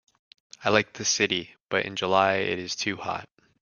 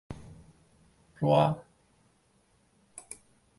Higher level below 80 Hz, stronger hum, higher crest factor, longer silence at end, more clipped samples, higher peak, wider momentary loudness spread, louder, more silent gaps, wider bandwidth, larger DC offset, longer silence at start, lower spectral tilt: about the same, -66 dBFS vs -62 dBFS; neither; about the same, 24 dB vs 22 dB; about the same, 0.35 s vs 0.45 s; neither; first, -2 dBFS vs -12 dBFS; second, 9 LU vs 26 LU; about the same, -26 LUFS vs -27 LUFS; first, 1.60-1.66 s vs none; about the same, 10.5 kHz vs 11.5 kHz; neither; first, 0.6 s vs 0.1 s; second, -2.5 dB/octave vs -7 dB/octave